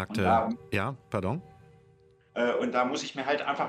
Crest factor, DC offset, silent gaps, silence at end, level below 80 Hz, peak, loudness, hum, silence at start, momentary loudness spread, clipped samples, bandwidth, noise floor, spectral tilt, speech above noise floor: 18 dB; under 0.1%; none; 0 s; -60 dBFS; -12 dBFS; -29 LUFS; none; 0 s; 8 LU; under 0.1%; 14.5 kHz; -61 dBFS; -5.5 dB/octave; 32 dB